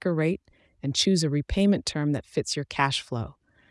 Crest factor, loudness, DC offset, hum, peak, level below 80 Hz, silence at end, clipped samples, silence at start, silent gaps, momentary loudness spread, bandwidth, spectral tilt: 20 dB; -26 LUFS; under 0.1%; none; -8 dBFS; -46 dBFS; 0.4 s; under 0.1%; 0.05 s; none; 11 LU; 12 kHz; -5 dB/octave